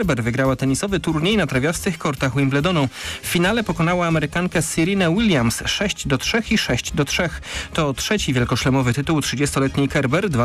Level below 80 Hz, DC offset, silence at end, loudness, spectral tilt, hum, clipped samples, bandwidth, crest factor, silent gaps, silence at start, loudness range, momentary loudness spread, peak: -38 dBFS; under 0.1%; 0 s; -20 LUFS; -5 dB/octave; none; under 0.1%; 15.5 kHz; 10 dB; none; 0 s; 1 LU; 4 LU; -10 dBFS